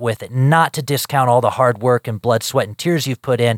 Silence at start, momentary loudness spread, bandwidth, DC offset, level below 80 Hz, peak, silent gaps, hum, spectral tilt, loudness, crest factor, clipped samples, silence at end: 0 s; 6 LU; 17 kHz; under 0.1%; -60 dBFS; 0 dBFS; none; none; -5.5 dB/octave; -17 LUFS; 16 dB; under 0.1%; 0 s